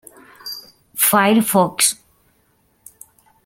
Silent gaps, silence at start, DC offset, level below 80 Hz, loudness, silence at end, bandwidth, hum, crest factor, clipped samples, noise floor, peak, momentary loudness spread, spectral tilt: none; 0.45 s; under 0.1%; -62 dBFS; -15 LUFS; 1.5 s; 17 kHz; none; 20 dB; under 0.1%; -61 dBFS; 0 dBFS; 20 LU; -3 dB/octave